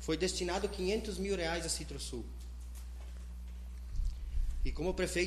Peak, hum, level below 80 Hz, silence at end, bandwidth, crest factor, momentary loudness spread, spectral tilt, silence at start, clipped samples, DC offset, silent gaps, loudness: -20 dBFS; 60 Hz at -45 dBFS; -40 dBFS; 0 s; 13.5 kHz; 16 dB; 13 LU; -4 dB/octave; 0 s; under 0.1%; under 0.1%; none; -38 LUFS